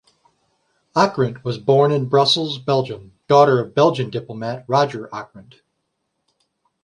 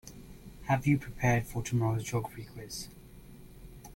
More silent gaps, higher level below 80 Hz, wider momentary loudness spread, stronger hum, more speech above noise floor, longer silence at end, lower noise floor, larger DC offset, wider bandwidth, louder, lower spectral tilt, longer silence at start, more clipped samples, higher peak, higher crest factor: neither; second, -60 dBFS vs -52 dBFS; second, 15 LU vs 24 LU; neither; first, 56 dB vs 20 dB; first, 1.4 s vs 0 s; first, -74 dBFS vs -51 dBFS; neither; second, 11 kHz vs 16.5 kHz; first, -18 LUFS vs -32 LUFS; about the same, -6 dB/octave vs -6 dB/octave; first, 0.95 s vs 0.05 s; neither; first, -2 dBFS vs -14 dBFS; about the same, 18 dB vs 20 dB